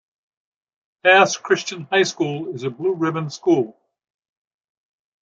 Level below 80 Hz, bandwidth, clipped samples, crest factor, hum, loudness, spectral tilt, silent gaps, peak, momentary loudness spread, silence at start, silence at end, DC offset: -72 dBFS; 7.8 kHz; under 0.1%; 20 dB; none; -19 LUFS; -4 dB/octave; none; -2 dBFS; 11 LU; 1.05 s; 1.5 s; under 0.1%